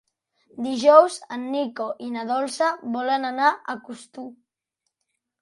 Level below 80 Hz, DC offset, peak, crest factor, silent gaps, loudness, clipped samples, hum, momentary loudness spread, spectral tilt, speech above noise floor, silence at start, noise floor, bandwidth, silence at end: -76 dBFS; under 0.1%; -2 dBFS; 22 dB; none; -22 LUFS; under 0.1%; none; 22 LU; -3.5 dB/octave; 58 dB; 0.55 s; -80 dBFS; 11.5 kHz; 1.1 s